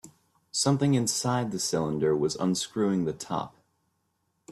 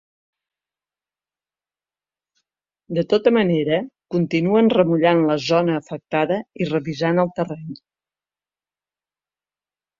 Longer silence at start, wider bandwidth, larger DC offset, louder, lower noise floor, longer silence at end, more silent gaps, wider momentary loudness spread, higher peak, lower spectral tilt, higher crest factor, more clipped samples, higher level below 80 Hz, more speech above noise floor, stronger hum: second, 0.05 s vs 2.9 s; first, 14 kHz vs 7.4 kHz; neither; second, -27 LUFS vs -20 LUFS; second, -75 dBFS vs under -90 dBFS; second, 0 s vs 2.25 s; neither; about the same, 9 LU vs 11 LU; second, -12 dBFS vs -2 dBFS; second, -5 dB/octave vs -7 dB/octave; about the same, 16 dB vs 20 dB; neither; about the same, -64 dBFS vs -64 dBFS; second, 49 dB vs over 71 dB; second, none vs 50 Hz at -50 dBFS